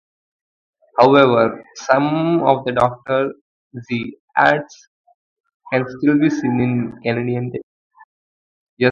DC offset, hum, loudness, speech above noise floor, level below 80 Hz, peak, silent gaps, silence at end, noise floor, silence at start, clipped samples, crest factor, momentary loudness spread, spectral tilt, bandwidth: under 0.1%; none; -17 LUFS; over 73 dB; -56 dBFS; 0 dBFS; 3.41-3.70 s, 4.20-4.28 s, 4.87-5.04 s, 5.14-5.44 s, 5.54-5.60 s, 7.63-7.90 s, 8.04-8.77 s; 0 s; under -90 dBFS; 0.95 s; under 0.1%; 18 dB; 13 LU; -7 dB/octave; 7.4 kHz